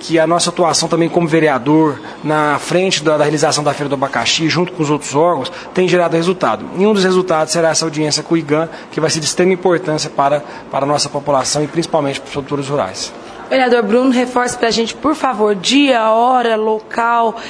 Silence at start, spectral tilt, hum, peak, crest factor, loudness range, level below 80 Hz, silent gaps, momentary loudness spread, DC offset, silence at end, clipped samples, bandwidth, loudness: 0 s; -4 dB/octave; none; 0 dBFS; 14 dB; 3 LU; -52 dBFS; none; 7 LU; under 0.1%; 0 s; under 0.1%; 11 kHz; -14 LUFS